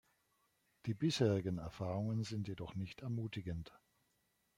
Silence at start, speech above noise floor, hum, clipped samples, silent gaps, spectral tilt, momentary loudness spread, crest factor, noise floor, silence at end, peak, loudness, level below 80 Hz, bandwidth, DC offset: 0.85 s; 41 dB; none; under 0.1%; none; -6.5 dB/octave; 12 LU; 20 dB; -80 dBFS; 0.8 s; -20 dBFS; -40 LUFS; -66 dBFS; 15.5 kHz; under 0.1%